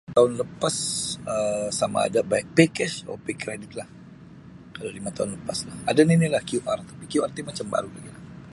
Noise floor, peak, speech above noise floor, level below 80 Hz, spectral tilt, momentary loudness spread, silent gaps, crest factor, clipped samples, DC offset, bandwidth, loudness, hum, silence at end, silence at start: -45 dBFS; -2 dBFS; 21 dB; -58 dBFS; -5 dB/octave; 17 LU; none; 24 dB; under 0.1%; under 0.1%; 11.5 kHz; -25 LUFS; none; 0 s; 0.1 s